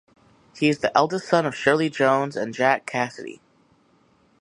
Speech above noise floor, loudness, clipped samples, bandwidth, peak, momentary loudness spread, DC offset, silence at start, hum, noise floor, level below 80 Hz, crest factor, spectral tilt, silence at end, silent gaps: 39 dB; -22 LUFS; under 0.1%; 11.5 kHz; -4 dBFS; 8 LU; under 0.1%; 0.55 s; none; -60 dBFS; -66 dBFS; 20 dB; -5 dB/octave; 1.05 s; none